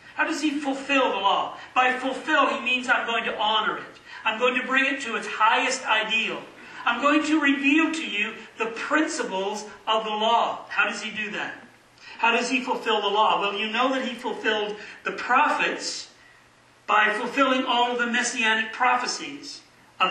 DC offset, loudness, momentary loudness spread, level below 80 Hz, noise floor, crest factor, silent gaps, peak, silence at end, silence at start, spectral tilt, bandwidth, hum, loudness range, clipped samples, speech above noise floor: under 0.1%; -23 LUFS; 11 LU; -72 dBFS; -56 dBFS; 18 dB; none; -8 dBFS; 0 s; 0.05 s; -2 dB/octave; 12 kHz; none; 3 LU; under 0.1%; 32 dB